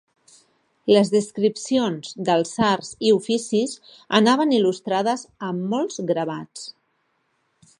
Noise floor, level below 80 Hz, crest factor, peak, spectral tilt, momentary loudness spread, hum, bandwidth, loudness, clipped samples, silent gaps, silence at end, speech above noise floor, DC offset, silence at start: -69 dBFS; -64 dBFS; 20 dB; -2 dBFS; -5 dB/octave; 12 LU; none; 11 kHz; -21 LUFS; under 0.1%; none; 1.1 s; 48 dB; under 0.1%; 0.85 s